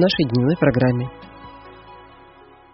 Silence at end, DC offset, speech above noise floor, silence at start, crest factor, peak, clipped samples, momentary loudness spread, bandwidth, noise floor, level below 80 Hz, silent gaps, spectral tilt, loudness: 0.75 s; under 0.1%; 29 dB; 0 s; 18 dB; -2 dBFS; under 0.1%; 24 LU; 5.8 kHz; -47 dBFS; -48 dBFS; none; -5.5 dB/octave; -19 LUFS